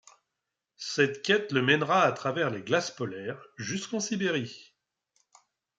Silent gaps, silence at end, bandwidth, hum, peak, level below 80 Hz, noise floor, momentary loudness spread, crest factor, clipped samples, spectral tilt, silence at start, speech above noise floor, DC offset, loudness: none; 1.15 s; 9.4 kHz; none; -8 dBFS; -76 dBFS; -86 dBFS; 14 LU; 22 dB; under 0.1%; -4 dB/octave; 0.8 s; 58 dB; under 0.1%; -28 LUFS